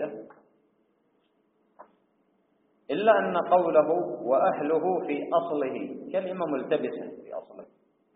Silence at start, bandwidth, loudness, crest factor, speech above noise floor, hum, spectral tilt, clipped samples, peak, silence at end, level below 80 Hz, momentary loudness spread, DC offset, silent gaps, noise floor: 0 s; 4 kHz; -26 LUFS; 22 dB; 44 dB; none; -4.5 dB/octave; under 0.1%; -6 dBFS; 0.5 s; -76 dBFS; 16 LU; under 0.1%; none; -70 dBFS